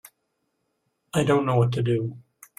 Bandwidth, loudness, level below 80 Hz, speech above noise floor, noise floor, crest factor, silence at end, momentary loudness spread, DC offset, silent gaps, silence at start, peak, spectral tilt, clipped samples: 14.5 kHz; -23 LUFS; -58 dBFS; 53 dB; -76 dBFS; 18 dB; 0.4 s; 8 LU; under 0.1%; none; 1.15 s; -8 dBFS; -7 dB/octave; under 0.1%